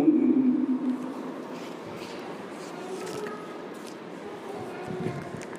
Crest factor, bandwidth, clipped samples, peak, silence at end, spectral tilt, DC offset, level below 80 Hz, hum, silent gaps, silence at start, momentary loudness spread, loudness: 20 dB; 13.5 kHz; under 0.1%; -10 dBFS; 0 s; -6.5 dB/octave; under 0.1%; -70 dBFS; none; none; 0 s; 16 LU; -31 LUFS